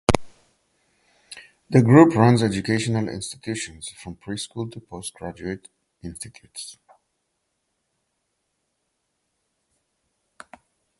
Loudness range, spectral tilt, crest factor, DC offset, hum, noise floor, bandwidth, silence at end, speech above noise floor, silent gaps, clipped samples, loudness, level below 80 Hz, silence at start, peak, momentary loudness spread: 22 LU; -6 dB/octave; 24 dB; under 0.1%; none; -76 dBFS; 11.5 kHz; 4.25 s; 54 dB; none; under 0.1%; -21 LUFS; -48 dBFS; 0.1 s; 0 dBFS; 24 LU